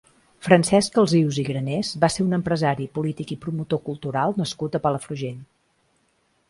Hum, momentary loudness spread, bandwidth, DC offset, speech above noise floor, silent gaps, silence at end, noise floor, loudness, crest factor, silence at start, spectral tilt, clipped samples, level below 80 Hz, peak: none; 12 LU; 11.5 kHz; under 0.1%; 45 dB; none; 1.05 s; -66 dBFS; -23 LUFS; 22 dB; 0.4 s; -5.5 dB/octave; under 0.1%; -56 dBFS; -2 dBFS